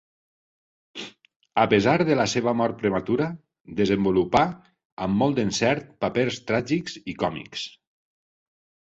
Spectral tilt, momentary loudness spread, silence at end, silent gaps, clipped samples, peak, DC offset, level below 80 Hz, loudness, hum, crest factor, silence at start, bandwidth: -5.5 dB/octave; 16 LU; 1.15 s; 1.36-1.40 s, 4.85-4.97 s; under 0.1%; -4 dBFS; under 0.1%; -54 dBFS; -24 LUFS; none; 20 dB; 0.95 s; 8.2 kHz